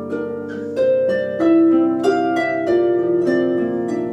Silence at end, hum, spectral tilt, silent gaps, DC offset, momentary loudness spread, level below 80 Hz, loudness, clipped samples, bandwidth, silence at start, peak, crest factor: 0 s; none; -7 dB/octave; none; under 0.1%; 11 LU; -58 dBFS; -18 LUFS; under 0.1%; 8.4 kHz; 0 s; -4 dBFS; 12 dB